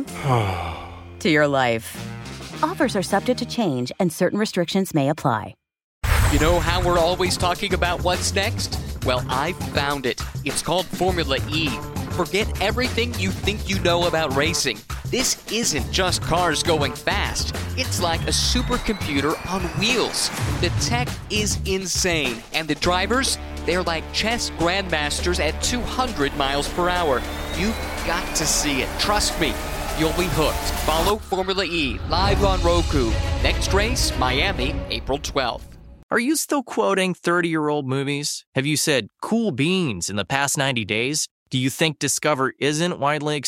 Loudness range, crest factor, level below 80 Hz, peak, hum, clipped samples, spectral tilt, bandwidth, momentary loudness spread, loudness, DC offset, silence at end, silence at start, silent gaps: 2 LU; 20 dB; -32 dBFS; -2 dBFS; none; under 0.1%; -4 dB/octave; 17 kHz; 6 LU; -22 LUFS; under 0.1%; 0 s; 0 s; 5.84-6.01 s, 36.03-36.09 s, 38.47-38.52 s, 41.31-41.46 s